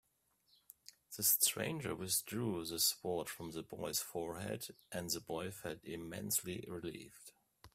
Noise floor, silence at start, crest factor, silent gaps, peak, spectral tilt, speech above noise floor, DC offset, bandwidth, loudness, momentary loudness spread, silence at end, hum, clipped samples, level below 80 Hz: -78 dBFS; 1.1 s; 26 dB; none; -14 dBFS; -2.5 dB/octave; 37 dB; under 0.1%; 16 kHz; -38 LUFS; 17 LU; 0.05 s; none; under 0.1%; -72 dBFS